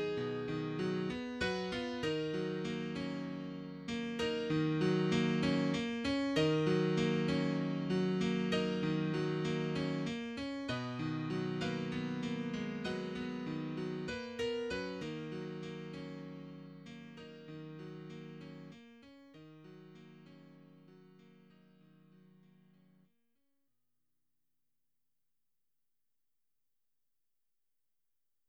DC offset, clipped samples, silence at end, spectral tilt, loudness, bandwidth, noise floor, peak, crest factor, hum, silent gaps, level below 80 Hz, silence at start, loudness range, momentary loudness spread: under 0.1%; under 0.1%; 7.2 s; -6.5 dB/octave; -37 LUFS; 10.5 kHz; under -90 dBFS; -20 dBFS; 18 dB; none; none; -66 dBFS; 0 s; 18 LU; 19 LU